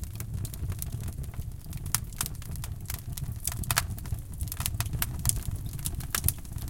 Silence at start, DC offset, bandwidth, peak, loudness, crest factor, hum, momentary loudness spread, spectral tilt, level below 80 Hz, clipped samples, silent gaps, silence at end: 0 s; under 0.1%; 17 kHz; 0 dBFS; -33 LUFS; 32 dB; none; 10 LU; -3 dB/octave; -40 dBFS; under 0.1%; none; 0 s